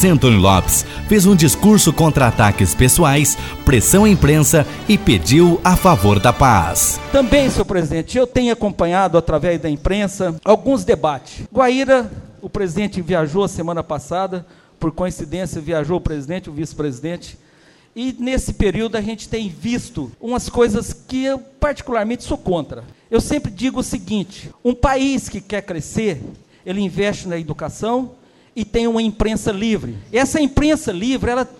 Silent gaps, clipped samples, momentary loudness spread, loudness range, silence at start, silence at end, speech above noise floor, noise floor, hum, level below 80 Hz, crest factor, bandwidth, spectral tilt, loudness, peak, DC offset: none; under 0.1%; 14 LU; 11 LU; 0 s; 0.15 s; 34 dB; -50 dBFS; none; -30 dBFS; 16 dB; 17.5 kHz; -5 dB/octave; -16 LUFS; 0 dBFS; under 0.1%